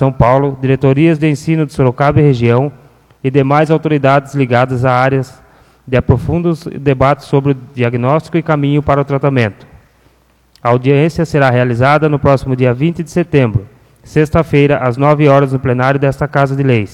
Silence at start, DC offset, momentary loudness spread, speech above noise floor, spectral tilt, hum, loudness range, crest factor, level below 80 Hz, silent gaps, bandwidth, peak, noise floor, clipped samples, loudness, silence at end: 0 s; under 0.1%; 6 LU; 39 dB; -8 dB/octave; none; 2 LU; 12 dB; -36 dBFS; none; 11 kHz; 0 dBFS; -51 dBFS; under 0.1%; -12 LUFS; 0.05 s